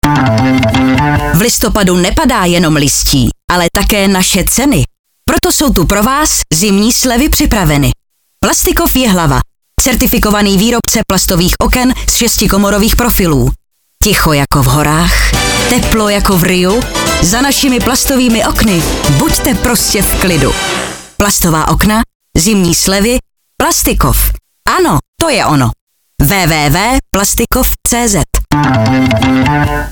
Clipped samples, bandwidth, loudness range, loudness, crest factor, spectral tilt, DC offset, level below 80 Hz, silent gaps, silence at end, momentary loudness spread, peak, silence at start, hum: under 0.1%; over 20 kHz; 1 LU; -9 LUFS; 10 dB; -4 dB/octave; under 0.1%; -20 dBFS; 3.44-3.48 s, 4.99-5.04 s, 22.15-22.20 s, 25.08-25.13 s, 25.81-25.87 s; 0 s; 4 LU; 0 dBFS; 0.05 s; none